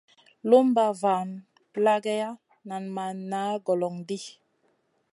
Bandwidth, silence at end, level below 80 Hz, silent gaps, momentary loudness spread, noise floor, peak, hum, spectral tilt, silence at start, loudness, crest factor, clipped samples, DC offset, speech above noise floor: 11.5 kHz; 0.85 s; -82 dBFS; none; 17 LU; -70 dBFS; -6 dBFS; none; -6 dB/octave; 0.45 s; -26 LUFS; 20 dB; under 0.1%; under 0.1%; 45 dB